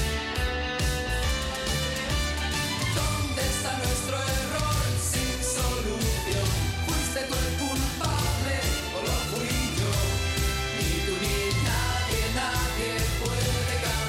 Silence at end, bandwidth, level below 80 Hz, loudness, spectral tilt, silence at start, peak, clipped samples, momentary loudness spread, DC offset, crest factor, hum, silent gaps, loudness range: 0 s; 16.5 kHz; -34 dBFS; -27 LUFS; -3.5 dB/octave; 0 s; -16 dBFS; under 0.1%; 2 LU; under 0.1%; 12 dB; none; none; 1 LU